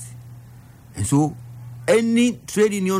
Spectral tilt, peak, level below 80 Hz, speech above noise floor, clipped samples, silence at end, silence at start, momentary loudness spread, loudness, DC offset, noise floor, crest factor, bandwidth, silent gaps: -5.5 dB/octave; -8 dBFS; -52 dBFS; 25 dB; under 0.1%; 0 s; 0 s; 21 LU; -20 LUFS; under 0.1%; -44 dBFS; 14 dB; 16 kHz; none